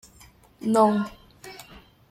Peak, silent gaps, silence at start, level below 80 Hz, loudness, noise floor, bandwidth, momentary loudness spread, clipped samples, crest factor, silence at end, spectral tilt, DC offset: -8 dBFS; none; 0.6 s; -58 dBFS; -23 LUFS; -53 dBFS; 15.5 kHz; 24 LU; under 0.1%; 20 dB; 0.3 s; -6 dB/octave; under 0.1%